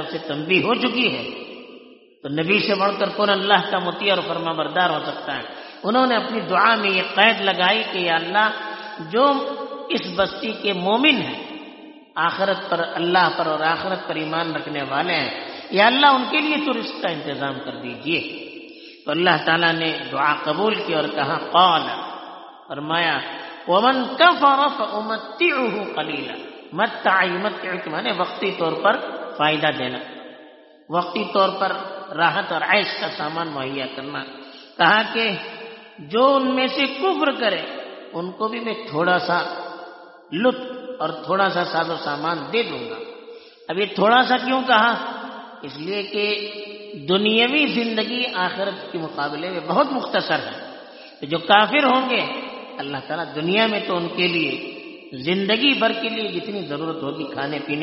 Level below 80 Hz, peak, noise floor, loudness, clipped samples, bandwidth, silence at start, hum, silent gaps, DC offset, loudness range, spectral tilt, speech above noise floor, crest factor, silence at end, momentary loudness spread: -68 dBFS; 0 dBFS; -46 dBFS; -20 LUFS; under 0.1%; 6 kHz; 0 s; none; none; under 0.1%; 4 LU; -1.5 dB/octave; 26 dB; 22 dB; 0 s; 16 LU